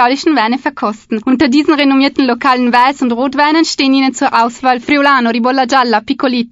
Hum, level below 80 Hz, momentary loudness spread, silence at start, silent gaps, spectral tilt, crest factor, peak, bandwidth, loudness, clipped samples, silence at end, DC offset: none; -52 dBFS; 5 LU; 0 s; none; -3.5 dB/octave; 12 dB; 0 dBFS; 7.8 kHz; -11 LUFS; 0.1%; 0.05 s; under 0.1%